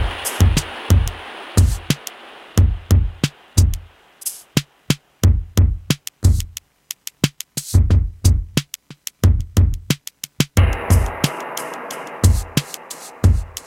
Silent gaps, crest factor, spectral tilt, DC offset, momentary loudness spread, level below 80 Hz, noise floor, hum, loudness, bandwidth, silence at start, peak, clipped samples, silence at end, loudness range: none; 18 dB; -5 dB/octave; under 0.1%; 14 LU; -24 dBFS; -40 dBFS; none; -19 LUFS; 16.5 kHz; 0 s; 0 dBFS; under 0.1%; 0.05 s; 2 LU